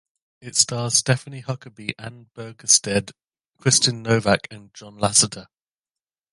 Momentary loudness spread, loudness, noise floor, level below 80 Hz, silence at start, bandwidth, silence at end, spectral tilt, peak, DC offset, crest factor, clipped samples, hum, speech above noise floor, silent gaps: 22 LU; -19 LUFS; under -90 dBFS; -54 dBFS; 0.45 s; 11.5 kHz; 0.9 s; -2.5 dB/octave; 0 dBFS; under 0.1%; 24 dB; under 0.1%; none; over 68 dB; none